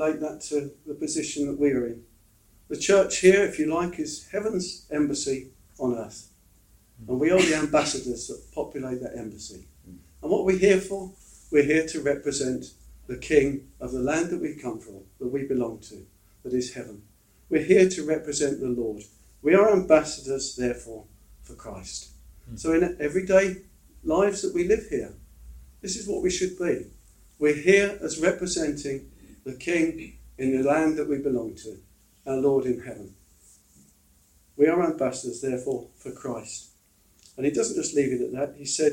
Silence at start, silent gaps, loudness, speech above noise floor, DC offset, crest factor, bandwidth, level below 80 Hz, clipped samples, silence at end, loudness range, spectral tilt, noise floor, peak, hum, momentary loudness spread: 0 s; none; -25 LUFS; 36 dB; under 0.1%; 22 dB; 16 kHz; -52 dBFS; under 0.1%; 0 s; 6 LU; -4.5 dB/octave; -61 dBFS; -4 dBFS; none; 20 LU